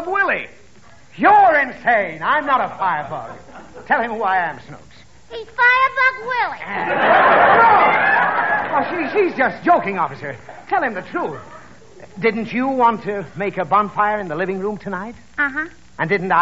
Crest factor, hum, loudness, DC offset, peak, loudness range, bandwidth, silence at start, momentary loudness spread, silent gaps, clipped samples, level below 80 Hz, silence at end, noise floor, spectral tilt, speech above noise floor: 16 dB; none; -17 LUFS; 0.6%; -2 dBFS; 7 LU; 7.8 kHz; 0 s; 17 LU; none; under 0.1%; -56 dBFS; 0 s; -48 dBFS; -2.5 dB/octave; 31 dB